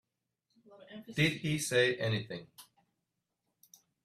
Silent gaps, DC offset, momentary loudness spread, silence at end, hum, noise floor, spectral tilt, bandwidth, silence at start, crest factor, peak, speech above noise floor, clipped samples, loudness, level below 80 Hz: none; under 0.1%; 19 LU; 1.4 s; none; -86 dBFS; -4.5 dB/octave; 15 kHz; 0.7 s; 20 dB; -16 dBFS; 53 dB; under 0.1%; -32 LUFS; -68 dBFS